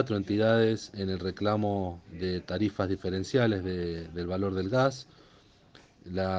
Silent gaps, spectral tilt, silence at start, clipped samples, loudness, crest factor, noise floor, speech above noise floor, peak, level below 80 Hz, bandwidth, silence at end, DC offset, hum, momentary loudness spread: none; -7 dB/octave; 0 s; under 0.1%; -30 LUFS; 18 dB; -59 dBFS; 30 dB; -12 dBFS; -58 dBFS; 9.2 kHz; 0 s; under 0.1%; none; 9 LU